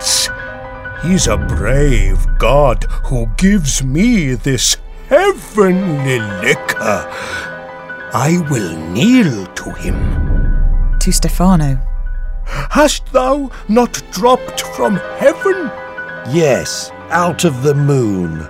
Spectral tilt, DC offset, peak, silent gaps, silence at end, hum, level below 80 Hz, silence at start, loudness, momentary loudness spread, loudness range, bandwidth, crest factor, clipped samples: -4.5 dB/octave; under 0.1%; 0 dBFS; none; 0 s; none; -18 dBFS; 0 s; -14 LUFS; 12 LU; 3 LU; 16 kHz; 14 dB; under 0.1%